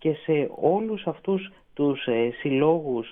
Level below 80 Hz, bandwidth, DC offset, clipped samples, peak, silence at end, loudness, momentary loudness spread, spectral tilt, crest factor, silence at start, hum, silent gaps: -62 dBFS; 3.8 kHz; under 0.1%; under 0.1%; -8 dBFS; 0 s; -25 LUFS; 7 LU; -10.5 dB/octave; 16 dB; 0 s; none; none